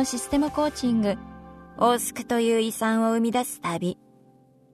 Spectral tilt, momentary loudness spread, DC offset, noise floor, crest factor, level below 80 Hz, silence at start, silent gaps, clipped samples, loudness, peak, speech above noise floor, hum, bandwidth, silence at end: -4.5 dB/octave; 13 LU; under 0.1%; -57 dBFS; 18 dB; -52 dBFS; 0 s; none; under 0.1%; -25 LUFS; -8 dBFS; 33 dB; none; 13.5 kHz; 0.8 s